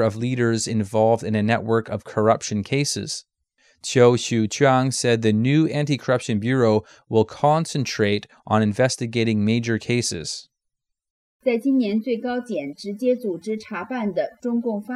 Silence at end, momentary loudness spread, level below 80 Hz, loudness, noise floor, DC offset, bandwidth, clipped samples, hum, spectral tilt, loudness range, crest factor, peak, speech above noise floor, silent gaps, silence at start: 0 s; 9 LU; -62 dBFS; -22 LUFS; -80 dBFS; under 0.1%; 13 kHz; under 0.1%; none; -5.5 dB/octave; 5 LU; 18 dB; -4 dBFS; 59 dB; 11.10-11.40 s; 0 s